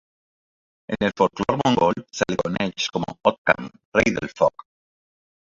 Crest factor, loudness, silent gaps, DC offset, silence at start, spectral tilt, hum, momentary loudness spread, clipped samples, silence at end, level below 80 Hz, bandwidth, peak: 22 dB; -22 LUFS; 3.38-3.45 s, 3.85-3.92 s; under 0.1%; 0.9 s; -5 dB/octave; none; 6 LU; under 0.1%; 0.95 s; -52 dBFS; 7.8 kHz; 0 dBFS